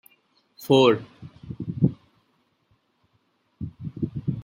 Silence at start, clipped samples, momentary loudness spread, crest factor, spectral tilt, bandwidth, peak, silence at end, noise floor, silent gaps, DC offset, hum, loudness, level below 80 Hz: 0.6 s; under 0.1%; 24 LU; 22 dB; -7 dB/octave; 16.5 kHz; -6 dBFS; 0 s; -69 dBFS; none; under 0.1%; none; -24 LUFS; -56 dBFS